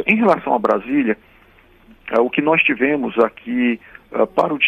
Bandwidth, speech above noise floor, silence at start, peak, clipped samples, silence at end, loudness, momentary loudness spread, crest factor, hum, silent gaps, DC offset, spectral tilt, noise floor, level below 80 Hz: 8.2 kHz; 33 dB; 0 s; 0 dBFS; under 0.1%; 0 s; -18 LUFS; 9 LU; 18 dB; none; none; under 0.1%; -7 dB/octave; -50 dBFS; -54 dBFS